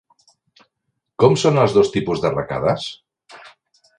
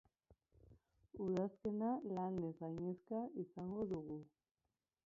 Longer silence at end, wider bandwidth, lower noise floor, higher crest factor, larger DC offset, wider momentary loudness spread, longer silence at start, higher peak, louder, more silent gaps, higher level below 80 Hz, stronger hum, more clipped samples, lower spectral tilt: second, 0.5 s vs 0.8 s; first, 10.5 kHz vs 7.2 kHz; second, -76 dBFS vs under -90 dBFS; about the same, 20 dB vs 16 dB; neither; first, 11 LU vs 7 LU; first, 1.2 s vs 0.3 s; first, 0 dBFS vs -30 dBFS; first, -18 LUFS vs -45 LUFS; neither; first, -50 dBFS vs -74 dBFS; neither; neither; second, -6 dB/octave vs -9.5 dB/octave